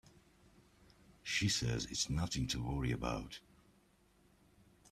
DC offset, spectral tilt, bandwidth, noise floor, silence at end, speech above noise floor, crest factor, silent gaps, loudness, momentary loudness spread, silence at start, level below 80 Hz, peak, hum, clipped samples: under 0.1%; -4 dB/octave; 14.5 kHz; -70 dBFS; 1.5 s; 32 dB; 20 dB; none; -37 LUFS; 14 LU; 1.25 s; -54 dBFS; -22 dBFS; none; under 0.1%